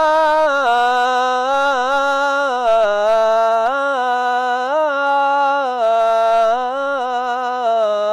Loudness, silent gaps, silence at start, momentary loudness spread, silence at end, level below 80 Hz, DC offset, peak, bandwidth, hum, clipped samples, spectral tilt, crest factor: -16 LUFS; none; 0 s; 5 LU; 0 s; -56 dBFS; under 0.1%; -8 dBFS; 12 kHz; 50 Hz at -65 dBFS; under 0.1%; -2 dB/octave; 8 dB